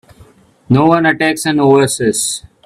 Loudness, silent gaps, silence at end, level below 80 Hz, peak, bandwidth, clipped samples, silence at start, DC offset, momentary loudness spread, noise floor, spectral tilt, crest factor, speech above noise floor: -12 LUFS; none; 0.25 s; -50 dBFS; 0 dBFS; 15.5 kHz; under 0.1%; 0.7 s; under 0.1%; 5 LU; -45 dBFS; -4.5 dB/octave; 14 dB; 33 dB